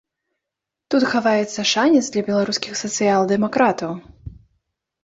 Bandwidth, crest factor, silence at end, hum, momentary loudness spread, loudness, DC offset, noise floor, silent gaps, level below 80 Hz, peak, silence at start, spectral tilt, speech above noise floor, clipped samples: 8 kHz; 18 dB; 0.75 s; none; 7 LU; -19 LUFS; under 0.1%; -84 dBFS; none; -54 dBFS; -4 dBFS; 0.9 s; -4 dB/octave; 65 dB; under 0.1%